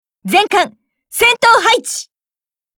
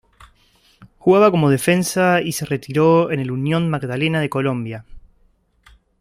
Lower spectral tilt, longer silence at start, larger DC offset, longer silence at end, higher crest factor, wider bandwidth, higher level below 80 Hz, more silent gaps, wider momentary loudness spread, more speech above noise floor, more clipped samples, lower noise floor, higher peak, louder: second, -1.5 dB/octave vs -6 dB/octave; second, 0.25 s vs 0.8 s; neither; second, 0.75 s vs 1 s; about the same, 14 dB vs 18 dB; first, over 20 kHz vs 16 kHz; about the same, -54 dBFS vs -52 dBFS; neither; first, 14 LU vs 9 LU; first, over 78 dB vs 41 dB; neither; first, under -90 dBFS vs -58 dBFS; about the same, 0 dBFS vs -2 dBFS; first, -12 LUFS vs -18 LUFS